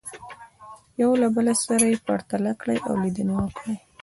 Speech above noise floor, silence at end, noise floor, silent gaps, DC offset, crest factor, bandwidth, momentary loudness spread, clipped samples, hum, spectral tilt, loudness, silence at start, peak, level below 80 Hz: 24 dB; 0.25 s; -47 dBFS; none; under 0.1%; 18 dB; 12 kHz; 18 LU; under 0.1%; none; -5 dB/octave; -23 LUFS; 0.05 s; -6 dBFS; -54 dBFS